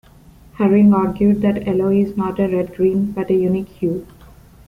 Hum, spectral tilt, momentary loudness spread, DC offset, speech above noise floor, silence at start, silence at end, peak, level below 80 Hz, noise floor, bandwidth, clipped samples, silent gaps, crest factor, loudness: none; -10 dB/octave; 9 LU; under 0.1%; 29 dB; 0.6 s; 0.6 s; -2 dBFS; -46 dBFS; -45 dBFS; 3.3 kHz; under 0.1%; none; 14 dB; -17 LUFS